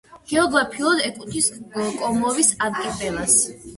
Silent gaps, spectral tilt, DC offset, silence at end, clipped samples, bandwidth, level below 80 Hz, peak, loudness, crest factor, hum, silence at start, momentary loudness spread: none; -2 dB/octave; under 0.1%; 0 s; under 0.1%; 12 kHz; -50 dBFS; -4 dBFS; -20 LUFS; 18 dB; none; 0.1 s; 9 LU